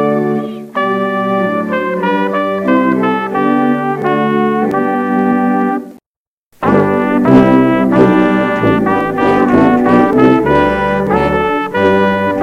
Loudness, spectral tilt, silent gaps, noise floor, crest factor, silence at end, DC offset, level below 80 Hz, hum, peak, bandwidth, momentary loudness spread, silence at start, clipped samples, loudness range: -12 LUFS; -8 dB/octave; 6.06-6.51 s; under -90 dBFS; 12 dB; 0 s; under 0.1%; -40 dBFS; none; 0 dBFS; 10.5 kHz; 6 LU; 0 s; under 0.1%; 4 LU